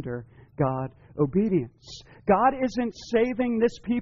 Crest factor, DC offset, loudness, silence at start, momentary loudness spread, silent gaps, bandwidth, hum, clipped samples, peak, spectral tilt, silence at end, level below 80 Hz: 16 dB; under 0.1%; -26 LUFS; 0 s; 15 LU; none; 7.4 kHz; none; under 0.1%; -8 dBFS; -6.5 dB/octave; 0 s; -52 dBFS